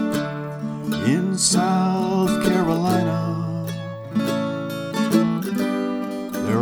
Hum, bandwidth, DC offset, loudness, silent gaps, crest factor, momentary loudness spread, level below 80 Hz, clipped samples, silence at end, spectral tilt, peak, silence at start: none; 19.5 kHz; under 0.1%; -22 LUFS; none; 18 dB; 9 LU; -52 dBFS; under 0.1%; 0 s; -5 dB/octave; -4 dBFS; 0 s